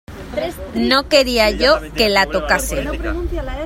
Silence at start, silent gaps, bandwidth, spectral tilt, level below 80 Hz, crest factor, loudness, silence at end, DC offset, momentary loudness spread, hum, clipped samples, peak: 0.1 s; none; 16.5 kHz; -3.5 dB/octave; -28 dBFS; 18 dB; -16 LUFS; 0 s; under 0.1%; 12 LU; none; under 0.1%; 0 dBFS